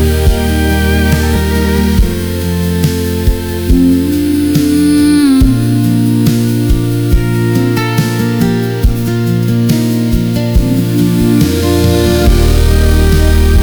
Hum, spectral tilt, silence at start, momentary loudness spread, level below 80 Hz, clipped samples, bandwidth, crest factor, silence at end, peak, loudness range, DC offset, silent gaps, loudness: none; -6.5 dB/octave; 0 s; 4 LU; -16 dBFS; under 0.1%; over 20 kHz; 10 dB; 0 s; 0 dBFS; 2 LU; under 0.1%; none; -11 LUFS